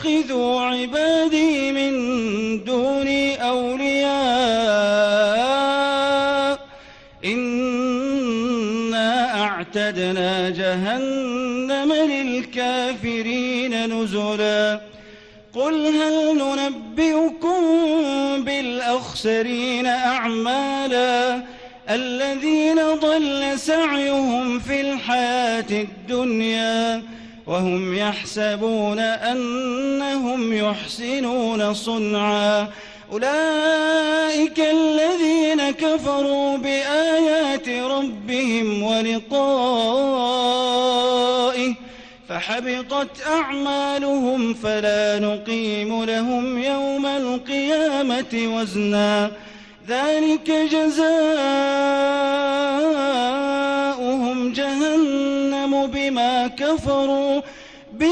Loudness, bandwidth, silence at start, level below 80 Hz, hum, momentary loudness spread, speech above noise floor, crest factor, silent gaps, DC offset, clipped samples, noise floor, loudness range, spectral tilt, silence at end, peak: -20 LUFS; 11 kHz; 0 s; -54 dBFS; none; 6 LU; 25 dB; 12 dB; none; under 0.1%; under 0.1%; -45 dBFS; 3 LU; -4 dB/octave; 0 s; -8 dBFS